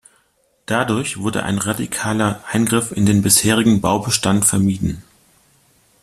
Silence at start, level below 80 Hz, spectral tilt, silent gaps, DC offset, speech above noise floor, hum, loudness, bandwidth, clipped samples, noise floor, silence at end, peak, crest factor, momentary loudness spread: 0.7 s; -46 dBFS; -4 dB/octave; none; under 0.1%; 44 dB; none; -17 LUFS; 14.5 kHz; under 0.1%; -62 dBFS; 1 s; 0 dBFS; 18 dB; 9 LU